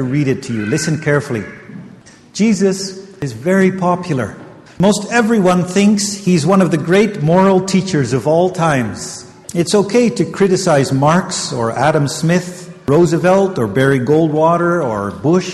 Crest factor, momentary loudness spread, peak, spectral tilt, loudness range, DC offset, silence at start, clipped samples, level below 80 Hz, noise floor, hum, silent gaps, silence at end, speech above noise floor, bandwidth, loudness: 14 dB; 11 LU; 0 dBFS; -5.5 dB/octave; 5 LU; under 0.1%; 0 s; under 0.1%; -48 dBFS; -40 dBFS; none; none; 0 s; 26 dB; 13 kHz; -14 LUFS